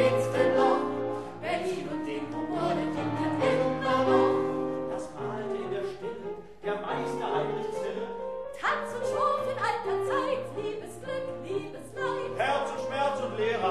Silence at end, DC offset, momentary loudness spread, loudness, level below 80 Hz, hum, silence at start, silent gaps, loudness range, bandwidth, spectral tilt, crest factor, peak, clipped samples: 0 s; 0.3%; 11 LU; -30 LUFS; -60 dBFS; none; 0 s; none; 5 LU; 12.5 kHz; -6 dB/octave; 16 dB; -12 dBFS; under 0.1%